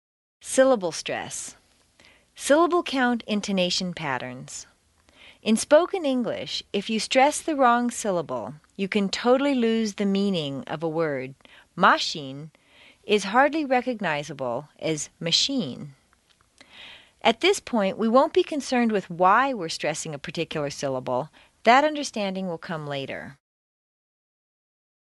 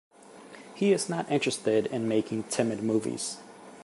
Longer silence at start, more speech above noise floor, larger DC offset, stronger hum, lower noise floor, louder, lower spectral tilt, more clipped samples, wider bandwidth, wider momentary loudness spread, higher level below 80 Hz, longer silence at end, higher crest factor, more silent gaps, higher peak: first, 0.45 s vs 0.3 s; first, 39 dB vs 22 dB; neither; neither; first, -63 dBFS vs -49 dBFS; first, -24 LUFS vs -28 LUFS; about the same, -4 dB/octave vs -4.5 dB/octave; neither; about the same, 11.5 kHz vs 11.5 kHz; second, 15 LU vs 19 LU; first, -64 dBFS vs -72 dBFS; first, 1.75 s vs 0 s; about the same, 22 dB vs 18 dB; neither; first, -4 dBFS vs -12 dBFS